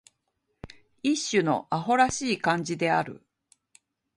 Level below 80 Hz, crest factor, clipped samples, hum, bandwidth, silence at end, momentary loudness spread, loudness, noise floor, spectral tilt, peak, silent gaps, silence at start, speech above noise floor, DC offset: -60 dBFS; 20 dB; under 0.1%; none; 11.5 kHz; 1 s; 5 LU; -26 LUFS; -77 dBFS; -4 dB/octave; -8 dBFS; none; 0.65 s; 52 dB; under 0.1%